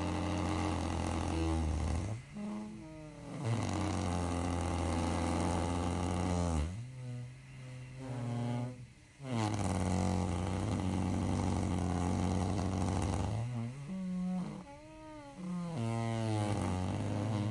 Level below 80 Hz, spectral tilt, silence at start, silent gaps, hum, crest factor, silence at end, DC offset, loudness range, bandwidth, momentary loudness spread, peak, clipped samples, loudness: -50 dBFS; -6.5 dB/octave; 0 s; none; none; 14 dB; 0 s; under 0.1%; 4 LU; 11.5 kHz; 13 LU; -20 dBFS; under 0.1%; -36 LUFS